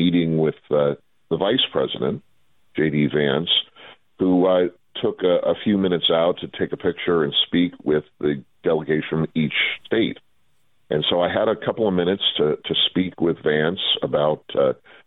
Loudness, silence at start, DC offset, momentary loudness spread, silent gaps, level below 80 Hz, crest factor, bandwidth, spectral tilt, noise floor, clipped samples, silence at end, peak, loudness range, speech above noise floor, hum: -21 LUFS; 0 s; under 0.1%; 7 LU; none; -56 dBFS; 16 dB; 4.1 kHz; -9 dB/octave; -69 dBFS; under 0.1%; 0.35 s; -4 dBFS; 2 LU; 48 dB; none